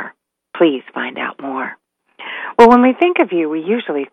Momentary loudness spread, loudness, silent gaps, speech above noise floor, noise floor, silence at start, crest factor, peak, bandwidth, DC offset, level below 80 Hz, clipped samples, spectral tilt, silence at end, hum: 20 LU; -15 LUFS; none; 25 dB; -39 dBFS; 0 s; 16 dB; 0 dBFS; 8.8 kHz; under 0.1%; -52 dBFS; 0.3%; -6 dB/octave; 0.05 s; none